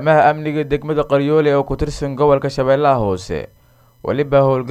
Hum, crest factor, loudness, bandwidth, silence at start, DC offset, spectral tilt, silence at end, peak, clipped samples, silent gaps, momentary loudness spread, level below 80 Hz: none; 14 dB; -16 LUFS; 12.5 kHz; 0 s; under 0.1%; -7 dB/octave; 0 s; -2 dBFS; under 0.1%; none; 9 LU; -36 dBFS